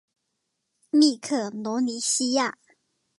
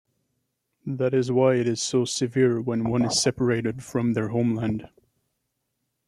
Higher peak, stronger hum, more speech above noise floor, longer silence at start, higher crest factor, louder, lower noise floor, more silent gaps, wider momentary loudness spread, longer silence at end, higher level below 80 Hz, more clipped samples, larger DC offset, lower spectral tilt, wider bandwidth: about the same, -8 dBFS vs -8 dBFS; neither; about the same, 55 dB vs 55 dB; about the same, 0.95 s vs 0.85 s; about the same, 18 dB vs 18 dB; about the same, -24 LUFS vs -24 LUFS; about the same, -79 dBFS vs -78 dBFS; neither; about the same, 8 LU vs 7 LU; second, 0.65 s vs 1.2 s; second, -82 dBFS vs -58 dBFS; neither; neither; second, -2 dB/octave vs -5 dB/octave; second, 11.5 kHz vs 13 kHz